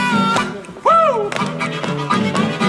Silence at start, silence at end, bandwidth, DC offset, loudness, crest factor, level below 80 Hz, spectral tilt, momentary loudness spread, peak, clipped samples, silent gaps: 0 s; 0 s; 12.5 kHz; under 0.1%; -17 LUFS; 16 dB; -54 dBFS; -5 dB/octave; 8 LU; 0 dBFS; under 0.1%; none